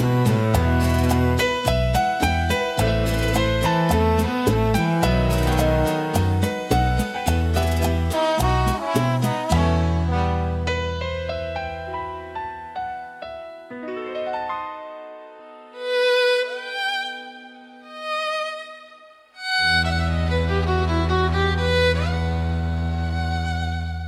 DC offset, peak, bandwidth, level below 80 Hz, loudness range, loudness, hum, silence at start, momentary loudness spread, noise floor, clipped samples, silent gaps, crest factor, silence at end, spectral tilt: under 0.1%; -4 dBFS; 15.5 kHz; -32 dBFS; 10 LU; -22 LUFS; none; 0 s; 14 LU; -48 dBFS; under 0.1%; none; 18 dB; 0 s; -5.5 dB/octave